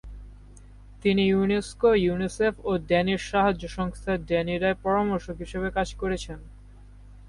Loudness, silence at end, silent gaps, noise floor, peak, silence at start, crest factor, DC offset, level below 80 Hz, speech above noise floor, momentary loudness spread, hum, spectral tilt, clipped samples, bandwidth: -26 LUFS; 0 s; none; -47 dBFS; -10 dBFS; 0.05 s; 16 dB; under 0.1%; -42 dBFS; 22 dB; 10 LU; 50 Hz at -45 dBFS; -6 dB/octave; under 0.1%; 11.5 kHz